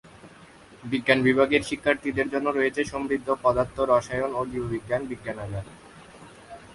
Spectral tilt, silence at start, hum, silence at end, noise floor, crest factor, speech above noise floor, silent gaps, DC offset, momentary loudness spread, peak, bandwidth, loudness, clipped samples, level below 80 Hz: -5.5 dB/octave; 0.15 s; none; 0 s; -50 dBFS; 22 dB; 25 dB; none; under 0.1%; 14 LU; -4 dBFS; 11.5 kHz; -25 LUFS; under 0.1%; -52 dBFS